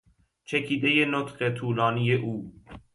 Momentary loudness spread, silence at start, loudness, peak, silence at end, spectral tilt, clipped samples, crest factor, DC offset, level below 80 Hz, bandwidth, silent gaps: 11 LU; 0.5 s; -26 LUFS; -10 dBFS; 0.15 s; -6.5 dB/octave; under 0.1%; 18 dB; under 0.1%; -60 dBFS; 11.5 kHz; none